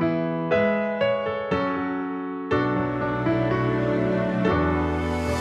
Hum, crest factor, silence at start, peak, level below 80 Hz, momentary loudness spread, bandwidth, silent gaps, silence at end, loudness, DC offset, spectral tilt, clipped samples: none; 14 dB; 0 s; -8 dBFS; -42 dBFS; 4 LU; 12 kHz; none; 0 s; -24 LUFS; under 0.1%; -7.5 dB/octave; under 0.1%